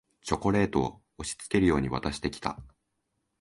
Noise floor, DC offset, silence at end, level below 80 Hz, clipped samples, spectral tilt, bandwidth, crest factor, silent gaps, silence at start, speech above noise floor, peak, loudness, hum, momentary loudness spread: -79 dBFS; under 0.1%; 0.75 s; -46 dBFS; under 0.1%; -5.5 dB/octave; 11.5 kHz; 20 dB; none; 0.25 s; 51 dB; -10 dBFS; -29 LUFS; none; 12 LU